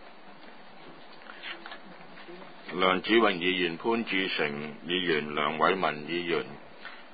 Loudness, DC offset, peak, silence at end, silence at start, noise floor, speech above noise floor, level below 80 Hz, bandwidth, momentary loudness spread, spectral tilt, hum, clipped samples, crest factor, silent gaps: -28 LUFS; 0.3%; -8 dBFS; 0 s; 0 s; -51 dBFS; 23 dB; -70 dBFS; 5 kHz; 24 LU; -8.5 dB/octave; none; under 0.1%; 22 dB; none